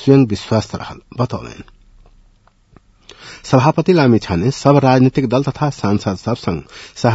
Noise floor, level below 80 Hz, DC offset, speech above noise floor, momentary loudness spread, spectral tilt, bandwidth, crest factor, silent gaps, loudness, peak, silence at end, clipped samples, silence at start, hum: -52 dBFS; -46 dBFS; under 0.1%; 37 dB; 16 LU; -7 dB/octave; 8 kHz; 16 dB; none; -15 LUFS; 0 dBFS; 0 s; under 0.1%; 0 s; none